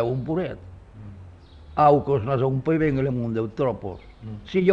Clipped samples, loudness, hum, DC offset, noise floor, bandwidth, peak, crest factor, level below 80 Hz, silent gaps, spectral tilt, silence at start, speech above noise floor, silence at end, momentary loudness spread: under 0.1%; -23 LUFS; none; under 0.1%; -45 dBFS; 6.8 kHz; -6 dBFS; 18 dB; -48 dBFS; none; -9.5 dB/octave; 0 s; 22 dB; 0 s; 23 LU